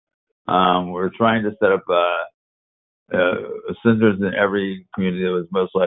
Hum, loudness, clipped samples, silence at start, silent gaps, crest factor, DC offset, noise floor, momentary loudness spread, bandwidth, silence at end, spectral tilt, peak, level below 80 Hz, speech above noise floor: none; -20 LUFS; under 0.1%; 0.45 s; 2.34-3.06 s; 18 dB; under 0.1%; under -90 dBFS; 9 LU; 4 kHz; 0 s; -11 dB/octave; -2 dBFS; -54 dBFS; over 71 dB